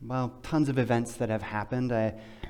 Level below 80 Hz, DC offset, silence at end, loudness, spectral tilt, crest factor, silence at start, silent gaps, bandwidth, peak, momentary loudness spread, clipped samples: -52 dBFS; under 0.1%; 0 s; -30 LUFS; -7 dB/octave; 16 dB; 0 s; none; 15 kHz; -14 dBFS; 6 LU; under 0.1%